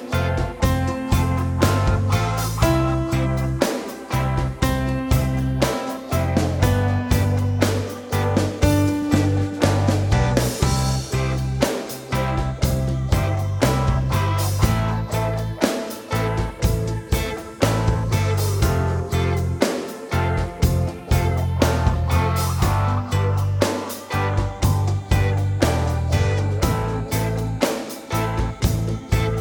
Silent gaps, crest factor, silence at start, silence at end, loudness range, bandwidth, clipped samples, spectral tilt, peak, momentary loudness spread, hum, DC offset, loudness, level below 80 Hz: none; 18 dB; 0 s; 0 s; 2 LU; over 20 kHz; under 0.1%; -6 dB/octave; -2 dBFS; 5 LU; none; under 0.1%; -21 LUFS; -28 dBFS